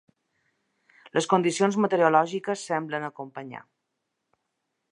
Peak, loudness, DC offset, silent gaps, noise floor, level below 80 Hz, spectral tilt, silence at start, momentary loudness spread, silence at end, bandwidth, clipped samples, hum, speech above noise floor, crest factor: -4 dBFS; -25 LUFS; under 0.1%; none; -80 dBFS; -80 dBFS; -5 dB/octave; 1.05 s; 18 LU; 1.3 s; 11 kHz; under 0.1%; none; 56 dB; 22 dB